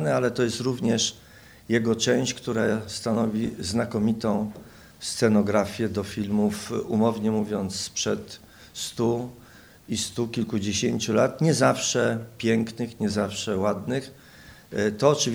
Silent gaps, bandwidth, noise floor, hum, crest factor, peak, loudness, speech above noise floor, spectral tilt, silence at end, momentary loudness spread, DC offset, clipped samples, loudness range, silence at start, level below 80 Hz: none; over 20 kHz; -49 dBFS; none; 20 dB; -4 dBFS; -25 LUFS; 24 dB; -4.5 dB/octave; 0 s; 10 LU; under 0.1%; under 0.1%; 4 LU; 0 s; -58 dBFS